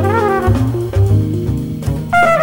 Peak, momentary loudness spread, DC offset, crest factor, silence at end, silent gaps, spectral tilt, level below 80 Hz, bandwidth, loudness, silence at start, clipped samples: 0 dBFS; 7 LU; under 0.1%; 12 dB; 0 s; none; -7.5 dB/octave; -28 dBFS; 18.5 kHz; -15 LUFS; 0 s; under 0.1%